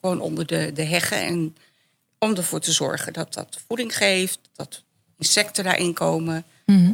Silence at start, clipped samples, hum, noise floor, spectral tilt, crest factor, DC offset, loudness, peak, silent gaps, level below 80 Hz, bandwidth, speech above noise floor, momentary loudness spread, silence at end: 0.05 s; under 0.1%; none; -67 dBFS; -3.5 dB/octave; 22 dB; under 0.1%; -22 LUFS; -2 dBFS; none; -68 dBFS; 17.5 kHz; 43 dB; 13 LU; 0 s